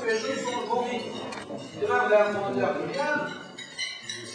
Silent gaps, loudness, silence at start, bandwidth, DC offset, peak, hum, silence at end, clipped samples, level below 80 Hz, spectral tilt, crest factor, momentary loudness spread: none; -28 LUFS; 0 s; 10.5 kHz; under 0.1%; -10 dBFS; none; 0 s; under 0.1%; -70 dBFS; -3.5 dB/octave; 18 dB; 14 LU